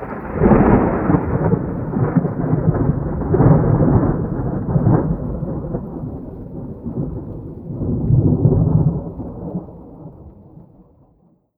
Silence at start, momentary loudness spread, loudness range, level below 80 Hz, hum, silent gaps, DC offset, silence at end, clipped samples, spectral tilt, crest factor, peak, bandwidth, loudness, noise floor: 0 s; 18 LU; 6 LU; -30 dBFS; none; none; under 0.1%; 1 s; under 0.1%; -14 dB/octave; 18 dB; 0 dBFS; 2.9 kHz; -18 LUFS; -56 dBFS